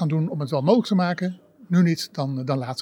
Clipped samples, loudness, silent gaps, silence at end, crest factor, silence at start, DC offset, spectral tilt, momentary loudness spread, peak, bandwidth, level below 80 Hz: under 0.1%; -23 LUFS; none; 0 s; 18 dB; 0 s; under 0.1%; -7 dB/octave; 8 LU; -4 dBFS; 16 kHz; -78 dBFS